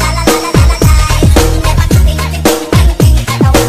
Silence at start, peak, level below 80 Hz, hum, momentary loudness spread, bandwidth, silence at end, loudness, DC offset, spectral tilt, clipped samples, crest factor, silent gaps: 0 s; 0 dBFS; -12 dBFS; none; 3 LU; 16 kHz; 0 s; -9 LUFS; under 0.1%; -5 dB/octave; 0.2%; 8 dB; none